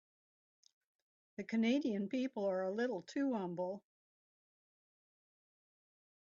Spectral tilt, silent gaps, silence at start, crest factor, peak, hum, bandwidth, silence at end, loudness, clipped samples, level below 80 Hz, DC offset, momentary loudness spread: -5 dB/octave; none; 1.4 s; 18 dB; -22 dBFS; none; 7.4 kHz; 2.45 s; -38 LUFS; under 0.1%; -86 dBFS; under 0.1%; 11 LU